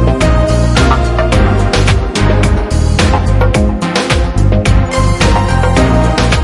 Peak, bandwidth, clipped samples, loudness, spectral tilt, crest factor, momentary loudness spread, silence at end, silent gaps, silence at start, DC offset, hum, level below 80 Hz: 0 dBFS; 11.5 kHz; under 0.1%; -11 LUFS; -6 dB/octave; 10 dB; 3 LU; 0 s; none; 0 s; 0.5%; none; -14 dBFS